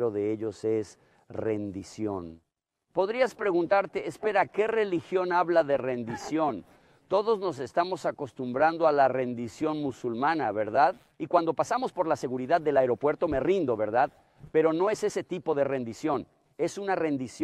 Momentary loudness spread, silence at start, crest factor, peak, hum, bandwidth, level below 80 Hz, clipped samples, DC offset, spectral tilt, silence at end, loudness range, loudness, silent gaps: 9 LU; 0 s; 18 dB; -10 dBFS; none; 12.5 kHz; -62 dBFS; under 0.1%; under 0.1%; -6 dB/octave; 0 s; 3 LU; -28 LUFS; none